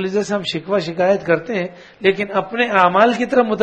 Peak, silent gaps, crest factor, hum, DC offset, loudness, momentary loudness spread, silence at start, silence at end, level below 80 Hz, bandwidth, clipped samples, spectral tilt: 0 dBFS; none; 16 dB; none; under 0.1%; -17 LUFS; 8 LU; 0 s; 0 s; -58 dBFS; 9.4 kHz; under 0.1%; -5.5 dB/octave